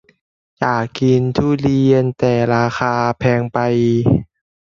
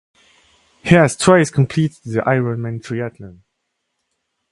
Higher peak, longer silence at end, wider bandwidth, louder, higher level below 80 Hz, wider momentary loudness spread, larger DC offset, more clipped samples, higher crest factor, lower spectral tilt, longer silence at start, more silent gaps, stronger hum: about the same, 0 dBFS vs 0 dBFS; second, 0.45 s vs 1.2 s; second, 7.2 kHz vs 11.5 kHz; about the same, -16 LUFS vs -16 LUFS; first, -42 dBFS vs -50 dBFS; second, 4 LU vs 13 LU; neither; neither; about the same, 16 dB vs 18 dB; first, -8 dB/octave vs -6 dB/octave; second, 0.6 s vs 0.85 s; neither; neither